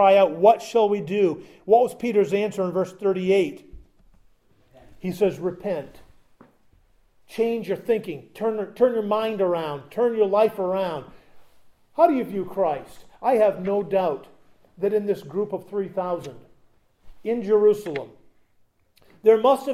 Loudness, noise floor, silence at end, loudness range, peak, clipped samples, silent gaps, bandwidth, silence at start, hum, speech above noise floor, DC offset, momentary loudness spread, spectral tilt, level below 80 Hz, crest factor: -23 LUFS; -61 dBFS; 0 s; 7 LU; -4 dBFS; under 0.1%; none; 14.5 kHz; 0 s; none; 40 dB; under 0.1%; 13 LU; -6.5 dB/octave; -60 dBFS; 20 dB